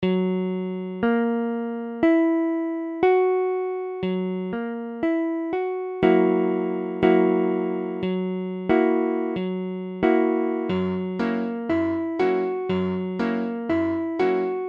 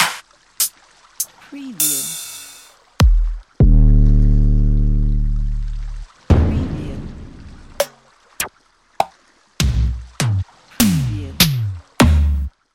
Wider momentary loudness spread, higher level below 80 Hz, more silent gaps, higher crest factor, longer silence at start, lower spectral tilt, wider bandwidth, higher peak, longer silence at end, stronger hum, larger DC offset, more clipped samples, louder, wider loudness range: second, 9 LU vs 18 LU; second, -58 dBFS vs -20 dBFS; neither; about the same, 18 dB vs 16 dB; about the same, 0 s vs 0 s; first, -9 dB/octave vs -4.5 dB/octave; second, 5.4 kHz vs 17 kHz; second, -4 dBFS vs 0 dBFS; second, 0 s vs 0.25 s; neither; neither; neither; second, -24 LUFS vs -18 LUFS; second, 2 LU vs 6 LU